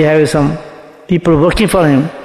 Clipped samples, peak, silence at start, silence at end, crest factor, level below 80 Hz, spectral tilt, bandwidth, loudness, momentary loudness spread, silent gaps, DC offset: under 0.1%; 0 dBFS; 0 s; 0 s; 12 dB; -30 dBFS; -6.5 dB/octave; 14 kHz; -11 LUFS; 7 LU; none; under 0.1%